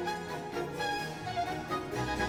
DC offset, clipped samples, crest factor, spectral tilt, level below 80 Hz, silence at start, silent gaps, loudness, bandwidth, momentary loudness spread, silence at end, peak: under 0.1%; under 0.1%; 16 dB; -4.5 dB/octave; -54 dBFS; 0 s; none; -35 LUFS; 19.5 kHz; 3 LU; 0 s; -20 dBFS